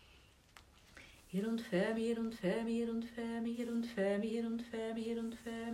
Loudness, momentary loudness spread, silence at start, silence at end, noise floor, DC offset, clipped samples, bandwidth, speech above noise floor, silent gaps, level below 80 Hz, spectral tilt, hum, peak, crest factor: -39 LUFS; 8 LU; 0.15 s; 0 s; -64 dBFS; under 0.1%; under 0.1%; 14.5 kHz; 26 dB; none; -68 dBFS; -6.5 dB/octave; none; -22 dBFS; 16 dB